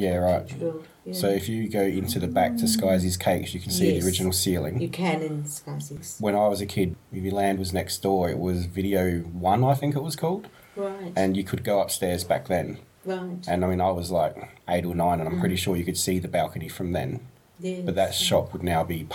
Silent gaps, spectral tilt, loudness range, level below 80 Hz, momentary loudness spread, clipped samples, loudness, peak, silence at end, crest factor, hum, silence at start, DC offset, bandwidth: none; -5 dB/octave; 3 LU; -52 dBFS; 10 LU; under 0.1%; -26 LUFS; -8 dBFS; 0 s; 16 dB; none; 0 s; under 0.1%; 19 kHz